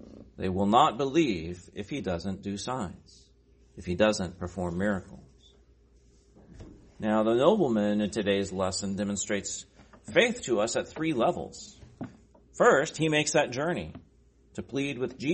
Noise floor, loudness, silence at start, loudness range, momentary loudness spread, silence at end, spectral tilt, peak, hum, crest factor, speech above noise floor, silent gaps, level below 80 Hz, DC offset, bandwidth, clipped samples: -60 dBFS; -28 LUFS; 0 s; 5 LU; 17 LU; 0 s; -4.5 dB/octave; -6 dBFS; none; 22 dB; 33 dB; none; -56 dBFS; under 0.1%; 8.8 kHz; under 0.1%